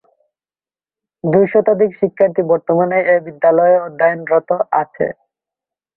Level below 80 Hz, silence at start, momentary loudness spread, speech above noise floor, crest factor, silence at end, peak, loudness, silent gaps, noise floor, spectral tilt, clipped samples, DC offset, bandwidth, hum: -62 dBFS; 1.25 s; 5 LU; over 76 dB; 14 dB; 0.85 s; -2 dBFS; -15 LUFS; none; under -90 dBFS; -12 dB/octave; under 0.1%; under 0.1%; 3.2 kHz; none